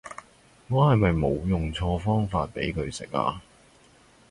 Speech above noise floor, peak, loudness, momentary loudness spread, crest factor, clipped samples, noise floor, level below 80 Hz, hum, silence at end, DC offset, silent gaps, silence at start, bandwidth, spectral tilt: 32 dB; -10 dBFS; -26 LUFS; 11 LU; 18 dB; under 0.1%; -57 dBFS; -40 dBFS; none; 0.9 s; under 0.1%; none; 0.05 s; 11.5 kHz; -7 dB/octave